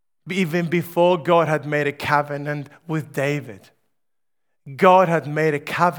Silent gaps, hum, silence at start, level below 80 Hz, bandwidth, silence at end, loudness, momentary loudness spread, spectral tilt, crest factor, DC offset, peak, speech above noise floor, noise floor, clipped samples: none; none; 0.25 s; -66 dBFS; over 20 kHz; 0 s; -20 LUFS; 13 LU; -6.5 dB/octave; 20 dB; under 0.1%; 0 dBFS; 65 dB; -85 dBFS; under 0.1%